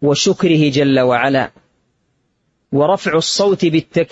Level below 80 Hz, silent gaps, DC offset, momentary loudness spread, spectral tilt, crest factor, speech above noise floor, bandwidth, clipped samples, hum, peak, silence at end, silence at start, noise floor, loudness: -54 dBFS; none; under 0.1%; 4 LU; -5 dB/octave; 14 dB; 51 dB; 8 kHz; under 0.1%; none; 0 dBFS; 0.05 s; 0 s; -65 dBFS; -14 LUFS